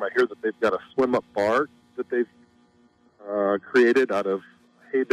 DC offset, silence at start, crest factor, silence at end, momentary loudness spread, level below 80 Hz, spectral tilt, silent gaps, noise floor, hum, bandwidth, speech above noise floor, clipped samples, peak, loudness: under 0.1%; 0 s; 14 dB; 0.1 s; 12 LU; -68 dBFS; -5.5 dB/octave; none; -60 dBFS; none; 10.5 kHz; 37 dB; under 0.1%; -10 dBFS; -24 LUFS